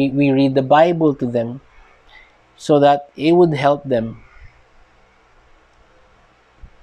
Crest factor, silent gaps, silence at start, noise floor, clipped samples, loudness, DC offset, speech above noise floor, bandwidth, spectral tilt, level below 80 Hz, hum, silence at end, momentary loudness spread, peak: 16 dB; none; 0 s; -53 dBFS; under 0.1%; -16 LUFS; under 0.1%; 38 dB; 9.8 kHz; -7.5 dB/octave; -50 dBFS; none; 2.35 s; 13 LU; -2 dBFS